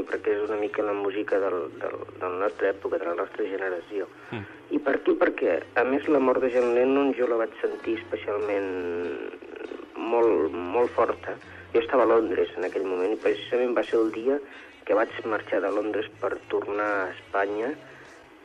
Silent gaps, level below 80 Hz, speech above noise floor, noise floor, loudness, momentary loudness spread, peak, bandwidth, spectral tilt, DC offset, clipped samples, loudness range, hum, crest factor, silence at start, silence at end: none; -66 dBFS; 23 dB; -48 dBFS; -26 LUFS; 12 LU; -10 dBFS; 9.2 kHz; -6 dB/octave; under 0.1%; under 0.1%; 5 LU; none; 16 dB; 0 s; 0 s